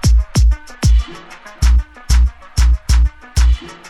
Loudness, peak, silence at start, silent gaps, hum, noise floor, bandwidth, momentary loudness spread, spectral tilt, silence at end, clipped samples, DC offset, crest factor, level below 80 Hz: -16 LUFS; -2 dBFS; 0.05 s; none; none; -35 dBFS; 12 kHz; 4 LU; -5 dB/octave; 0.15 s; under 0.1%; under 0.1%; 12 dB; -14 dBFS